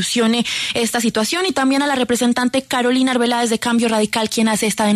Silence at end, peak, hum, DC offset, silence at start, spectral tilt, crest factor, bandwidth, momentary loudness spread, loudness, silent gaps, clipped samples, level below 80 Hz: 0 s; -6 dBFS; none; under 0.1%; 0 s; -3 dB/octave; 10 dB; 13.5 kHz; 2 LU; -17 LUFS; none; under 0.1%; -56 dBFS